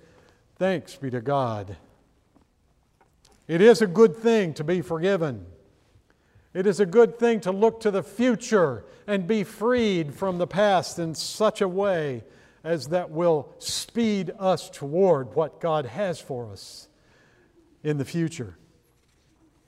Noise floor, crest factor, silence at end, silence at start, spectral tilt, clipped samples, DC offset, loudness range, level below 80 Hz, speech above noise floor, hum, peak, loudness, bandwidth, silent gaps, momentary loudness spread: -65 dBFS; 20 dB; 1.15 s; 0.6 s; -5.5 dB/octave; under 0.1%; under 0.1%; 8 LU; -62 dBFS; 41 dB; none; -4 dBFS; -24 LUFS; 15 kHz; none; 15 LU